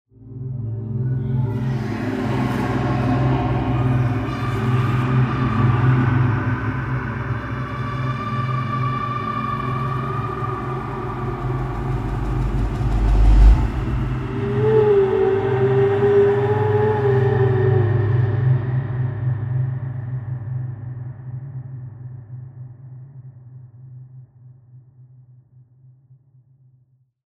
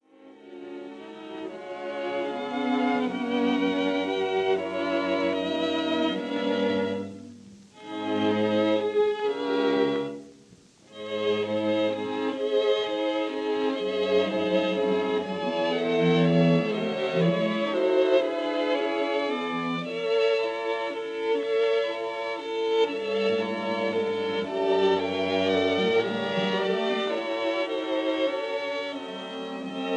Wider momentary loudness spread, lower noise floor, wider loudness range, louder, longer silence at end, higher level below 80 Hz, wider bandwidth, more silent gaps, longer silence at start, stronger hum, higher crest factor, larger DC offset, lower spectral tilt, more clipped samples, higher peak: first, 17 LU vs 11 LU; first, -59 dBFS vs -54 dBFS; first, 14 LU vs 4 LU; first, -20 LUFS vs -26 LUFS; first, 2.15 s vs 0 s; first, -28 dBFS vs -72 dBFS; second, 6.2 kHz vs 9.6 kHz; neither; about the same, 0.2 s vs 0.2 s; neither; about the same, 18 dB vs 16 dB; neither; first, -9 dB/octave vs -6.5 dB/octave; neither; first, -2 dBFS vs -10 dBFS